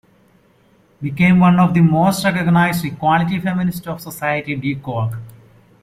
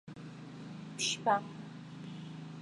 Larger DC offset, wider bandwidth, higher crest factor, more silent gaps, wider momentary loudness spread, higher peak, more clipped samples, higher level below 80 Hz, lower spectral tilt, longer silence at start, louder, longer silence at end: neither; first, 15.5 kHz vs 11.5 kHz; second, 14 dB vs 24 dB; neither; about the same, 14 LU vs 16 LU; first, -2 dBFS vs -14 dBFS; neither; first, -50 dBFS vs -78 dBFS; first, -7 dB/octave vs -3 dB/octave; first, 1 s vs 0.05 s; first, -16 LUFS vs -37 LUFS; first, 0.5 s vs 0 s